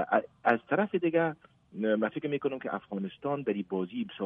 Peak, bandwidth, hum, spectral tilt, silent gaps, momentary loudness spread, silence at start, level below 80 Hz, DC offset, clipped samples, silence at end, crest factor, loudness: -10 dBFS; 4.7 kHz; none; -9 dB/octave; none; 8 LU; 0 s; -74 dBFS; under 0.1%; under 0.1%; 0 s; 22 dB; -31 LUFS